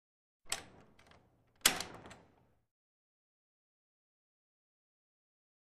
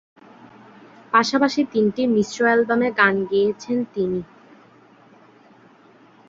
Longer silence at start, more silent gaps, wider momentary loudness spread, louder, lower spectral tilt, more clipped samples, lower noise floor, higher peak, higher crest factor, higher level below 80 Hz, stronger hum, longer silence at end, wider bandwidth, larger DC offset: second, 0.45 s vs 1.15 s; neither; first, 22 LU vs 8 LU; second, -35 LUFS vs -20 LUFS; second, 0 dB/octave vs -5 dB/octave; neither; first, -69 dBFS vs -51 dBFS; second, -10 dBFS vs -2 dBFS; first, 36 dB vs 20 dB; second, -68 dBFS vs -62 dBFS; neither; first, 3.6 s vs 2.05 s; first, 13.5 kHz vs 7.8 kHz; neither